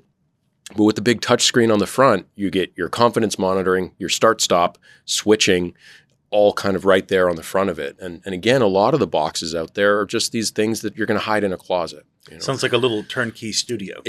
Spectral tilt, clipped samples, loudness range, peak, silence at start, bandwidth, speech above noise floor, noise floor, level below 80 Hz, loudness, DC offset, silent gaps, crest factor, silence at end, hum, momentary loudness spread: -4 dB/octave; under 0.1%; 4 LU; 0 dBFS; 0.7 s; 14 kHz; 48 dB; -67 dBFS; -60 dBFS; -19 LUFS; under 0.1%; none; 20 dB; 0 s; none; 9 LU